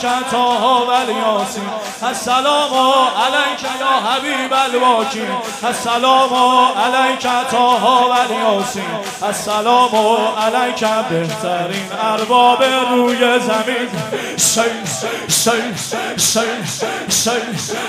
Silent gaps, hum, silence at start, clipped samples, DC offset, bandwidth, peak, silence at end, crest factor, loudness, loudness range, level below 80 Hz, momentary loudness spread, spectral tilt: none; none; 0 s; under 0.1%; under 0.1%; 16 kHz; 0 dBFS; 0 s; 16 dB; -15 LUFS; 2 LU; -60 dBFS; 9 LU; -2.5 dB/octave